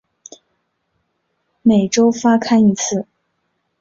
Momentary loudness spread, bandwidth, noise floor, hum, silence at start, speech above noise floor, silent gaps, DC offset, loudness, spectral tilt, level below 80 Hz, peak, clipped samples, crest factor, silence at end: 9 LU; 7.8 kHz; -69 dBFS; none; 1.65 s; 56 dB; none; under 0.1%; -15 LUFS; -5 dB/octave; -56 dBFS; -2 dBFS; under 0.1%; 16 dB; 0.8 s